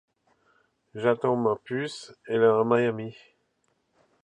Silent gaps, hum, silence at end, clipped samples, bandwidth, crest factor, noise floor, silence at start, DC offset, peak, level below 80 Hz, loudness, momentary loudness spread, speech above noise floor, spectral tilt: none; none; 1.15 s; under 0.1%; 9.6 kHz; 20 dB; -73 dBFS; 0.95 s; under 0.1%; -8 dBFS; -72 dBFS; -26 LUFS; 17 LU; 48 dB; -6.5 dB/octave